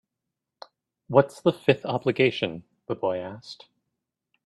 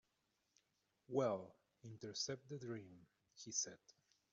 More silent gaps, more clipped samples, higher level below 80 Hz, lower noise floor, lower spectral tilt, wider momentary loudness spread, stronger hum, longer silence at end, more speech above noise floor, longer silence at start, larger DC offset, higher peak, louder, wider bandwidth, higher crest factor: neither; neither; first, -68 dBFS vs -88 dBFS; about the same, -85 dBFS vs -86 dBFS; first, -6.5 dB/octave vs -4.5 dB/octave; about the same, 19 LU vs 21 LU; neither; first, 0.9 s vs 0.4 s; first, 61 dB vs 40 dB; about the same, 1.1 s vs 1.1 s; neither; first, -4 dBFS vs -26 dBFS; first, -25 LUFS vs -45 LUFS; first, 12 kHz vs 8 kHz; about the same, 24 dB vs 22 dB